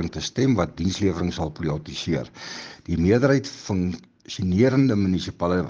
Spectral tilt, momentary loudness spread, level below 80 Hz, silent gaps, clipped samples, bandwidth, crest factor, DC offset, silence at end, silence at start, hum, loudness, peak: -6.5 dB/octave; 15 LU; -44 dBFS; none; under 0.1%; 7.6 kHz; 18 dB; under 0.1%; 0 s; 0 s; none; -23 LUFS; -4 dBFS